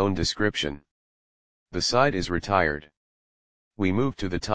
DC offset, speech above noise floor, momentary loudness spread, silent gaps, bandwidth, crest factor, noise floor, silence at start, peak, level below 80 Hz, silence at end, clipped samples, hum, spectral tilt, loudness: 0.9%; over 65 dB; 11 LU; 0.91-1.66 s, 2.97-3.71 s; 10 kHz; 22 dB; under -90 dBFS; 0 s; -6 dBFS; -46 dBFS; 0 s; under 0.1%; none; -4.5 dB/octave; -25 LUFS